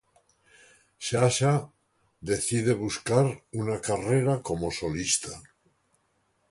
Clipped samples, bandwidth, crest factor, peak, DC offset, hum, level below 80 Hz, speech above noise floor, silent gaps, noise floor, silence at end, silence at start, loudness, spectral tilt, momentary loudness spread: under 0.1%; 11.5 kHz; 22 dB; -8 dBFS; under 0.1%; none; -54 dBFS; 45 dB; none; -71 dBFS; 1.1 s; 1 s; -27 LUFS; -4.5 dB/octave; 11 LU